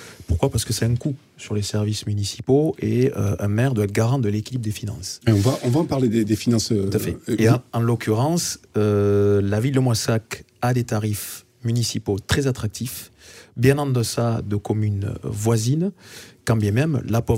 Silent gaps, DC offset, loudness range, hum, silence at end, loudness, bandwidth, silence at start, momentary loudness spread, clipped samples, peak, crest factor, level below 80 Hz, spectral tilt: none; under 0.1%; 3 LU; none; 0 s; -22 LUFS; 16 kHz; 0 s; 9 LU; under 0.1%; -2 dBFS; 20 dB; -44 dBFS; -6 dB/octave